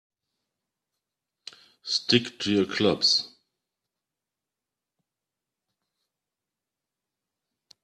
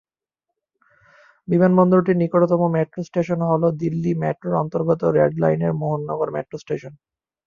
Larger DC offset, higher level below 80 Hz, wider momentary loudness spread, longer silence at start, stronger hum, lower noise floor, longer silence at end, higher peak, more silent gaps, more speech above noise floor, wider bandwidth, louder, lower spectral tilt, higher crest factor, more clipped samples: neither; second, -70 dBFS vs -58 dBFS; about the same, 11 LU vs 11 LU; first, 1.85 s vs 1.5 s; neither; first, -88 dBFS vs -83 dBFS; first, 4.55 s vs 0.55 s; second, -6 dBFS vs -2 dBFS; neither; about the same, 64 dB vs 64 dB; first, 12.5 kHz vs 7 kHz; second, -24 LUFS vs -20 LUFS; second, -3.5 dB/octave vs -10 dB/octave; first, 26 dB vs 18 dB; neither